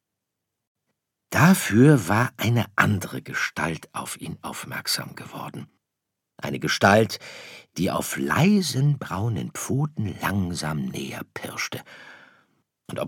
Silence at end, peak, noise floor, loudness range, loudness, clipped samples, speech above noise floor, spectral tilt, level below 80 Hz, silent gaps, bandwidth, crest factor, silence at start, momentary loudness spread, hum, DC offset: 0 s; -2 dBFS; -83 dBFS; 9 LU; -23 LUFS; under 0.1%; 59 dB; -5 dB/octave; -58 dBFS; none; 18 kHz; 24 dB; 1.3 s; 18 LU; none; under 0.1%